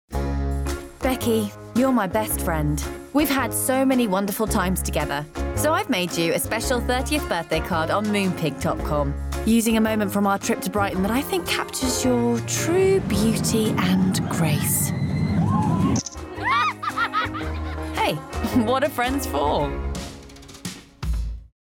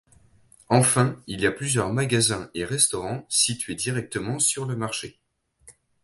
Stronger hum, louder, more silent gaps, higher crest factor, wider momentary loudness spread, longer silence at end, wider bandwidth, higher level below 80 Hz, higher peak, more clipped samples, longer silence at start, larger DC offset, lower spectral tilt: neither; about the same, -23 LUFS vs -23 LUFS; neither; second, 12 dB vs 22 dB; about the same, 9 LU vs 10 LU; about the same, 0.2 s vs 0.3 s; first, 18 kHz vs 12 kHz; first, -34 dBFS vs -54 dBFS; second, -10 dBFS vs -4 dBFS; neither; second, 0.1 s vs 0.7 s; neither; first, -5 dB/octave vs -3.5 dB/octave